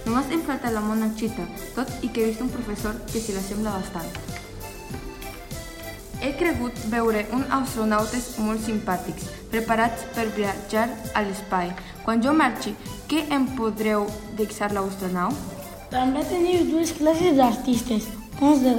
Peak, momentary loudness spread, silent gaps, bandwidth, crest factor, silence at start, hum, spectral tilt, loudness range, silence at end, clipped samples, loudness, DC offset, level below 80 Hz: -6 dBFS; 15 LU; none; 17 kHz; 20 dB; 0 s; none; -5 dB/octave; 8 LU; 0 s; under 0.1%; -25 LUFS; under 0.1%; -44 dBFS